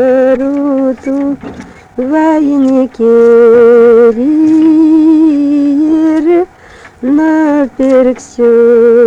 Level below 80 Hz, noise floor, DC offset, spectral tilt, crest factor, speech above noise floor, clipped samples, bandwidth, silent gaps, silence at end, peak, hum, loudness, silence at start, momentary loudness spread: -44 dBFS; -35 dBFS; under 0.1%; -7 dB/octave; 8 dB; 29 dB; under 0.1%; 8 kHz; none; 0 s; 0 dBFS; none; -8 LUFS; 0 s; 10 LU